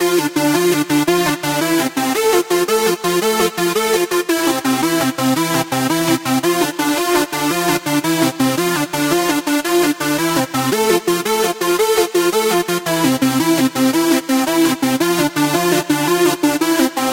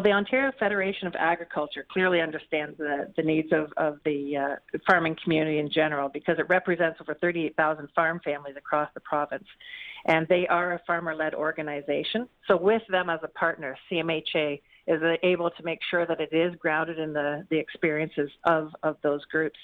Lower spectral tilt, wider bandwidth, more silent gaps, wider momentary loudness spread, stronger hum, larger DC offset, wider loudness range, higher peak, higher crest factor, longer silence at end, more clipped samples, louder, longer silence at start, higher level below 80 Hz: second, -3.5 dB/octave vs -7.5 dB/octave; first, 17 kHz vs 6.4 kHz; neither; second, 2 LU vs 8 LU; neither; neither; about the same, 1 LU vs 2 LU; first, -2 dBFS vs -8 dBFS; about the same, 14 dB vs 18 dB; about the same, 0 s vs 0 s; neither; first, -16 LUFS vs -27 LUFS; about the same, 0 s vs 0 s; first, -54 dBFS vs -66 dBFS